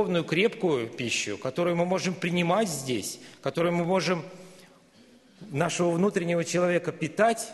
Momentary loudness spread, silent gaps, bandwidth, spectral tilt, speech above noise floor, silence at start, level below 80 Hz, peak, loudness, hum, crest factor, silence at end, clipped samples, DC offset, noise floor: 7 LU; none; 12.5 kHz; -5 dB/octave; 30 dB; 0 s; -68 dBFS; -8 dBFS; -27 LUFS; none; 18 dB; 0 s; under 0.1%; under 0.1%; -56 dBFS